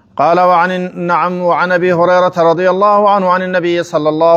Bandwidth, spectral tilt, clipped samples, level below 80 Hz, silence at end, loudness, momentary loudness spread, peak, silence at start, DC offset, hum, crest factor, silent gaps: 8.2 kHz; -6.5 dB/octave; under 0.1%; -62 dBFS; 0 s; -11 LUFS; 5 LU; 0 dBFS; 0.15 s; under 0.1%; none; 10 dB; none